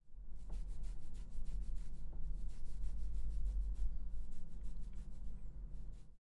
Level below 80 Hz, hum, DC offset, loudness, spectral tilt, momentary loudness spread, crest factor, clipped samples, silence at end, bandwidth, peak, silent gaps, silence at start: -44 dBFS; none; under 0.1%; -50 LUFS; -7 dB/octave; 9 LU; 12 dB; under 0.1%; 0.2 s; 1.4 kHz; -26 dBFS; none; 0.05 s